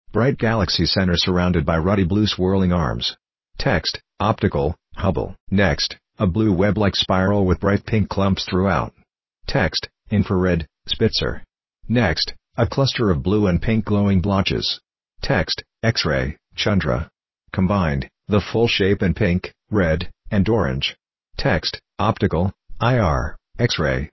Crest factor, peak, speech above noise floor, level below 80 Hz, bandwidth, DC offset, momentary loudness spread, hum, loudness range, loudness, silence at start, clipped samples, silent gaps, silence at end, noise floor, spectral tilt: 18 dB; -2 dBFS; 34 dB; -34 dBFS; 6.2 kHz; under 0.1%; 7 LU; none; 3 LU; -20 LUFS; 0.15 s; under 0.1%; 5.40-5.47 s; 0.05 s; -53 dBFS; -6.5 dB/octave